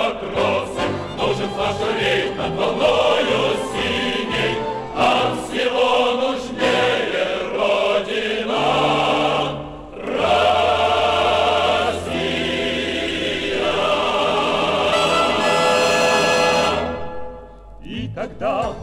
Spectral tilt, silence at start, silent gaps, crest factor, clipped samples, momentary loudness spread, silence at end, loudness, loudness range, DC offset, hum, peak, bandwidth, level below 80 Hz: -4 dB/octave; 0 s; none; 14 dB; under 0.1%; 8 LU; 0 s; -19 LUFS; 3 LU; under 0.1%; none; -4 dBFS; 16 kHz; -44 dBFS